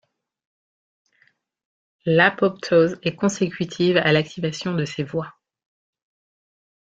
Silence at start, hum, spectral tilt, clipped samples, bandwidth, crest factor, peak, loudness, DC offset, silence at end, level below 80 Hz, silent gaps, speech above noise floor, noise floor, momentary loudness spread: 2.05 s; none; -5.5 dB/octave; under 0.1%; 8 kHz; 22 dB; -2 dBFS; -21 LUFS; under 0.1%; 1.6 s; -62 dBFS; none; 43 dB; -64 dBFS; 11 LU